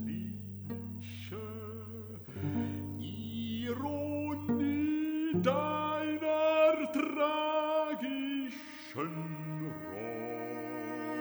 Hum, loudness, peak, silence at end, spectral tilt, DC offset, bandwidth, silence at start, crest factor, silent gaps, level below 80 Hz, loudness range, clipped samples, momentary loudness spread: none; -35 LUFS; -16 dBFS; 0 s; -7 dB/octave; under 0.1%; over 20 kHz; 0 s; 18 dB; none; -74 dBFS; 9 LU; under 0.1%; 12 LU